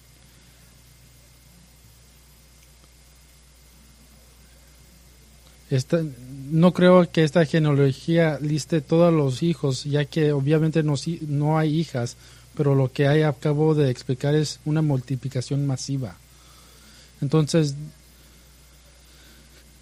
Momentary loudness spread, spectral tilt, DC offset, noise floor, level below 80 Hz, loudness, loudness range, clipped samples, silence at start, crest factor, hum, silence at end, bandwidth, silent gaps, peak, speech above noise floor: 10 LU; -7 dB/octave; under 0.1%; -52 dBFS; -54 dBFS; -22 LUFS; 9 LU; under 0.1%; 5.7 s; 20 dB; none; 1.95 s; 14.5 kHz; none; -4 dBFS; 31 dB